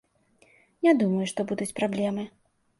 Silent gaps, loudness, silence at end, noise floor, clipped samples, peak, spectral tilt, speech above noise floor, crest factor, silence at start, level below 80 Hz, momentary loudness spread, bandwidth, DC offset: none; -26 LUFS; 0.5 s; -63 dBFS; under 0.1%; -8 dBFS; -6 dB/octave; 37 dB; 20 dB; 0.8 s; -70 dBFS; 10 LU; 11.5 kHz; under 0.1%